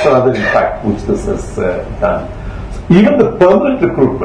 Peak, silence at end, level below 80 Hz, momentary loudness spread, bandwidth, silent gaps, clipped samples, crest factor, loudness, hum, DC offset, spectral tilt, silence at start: 0 dBFS; 0 s; -28 dBFS; 12 LU; 10 kHz; none; 0.4%; 12 dB; -12 LUFS; none; under 0.1%; -7.5 dB/octave; 0 s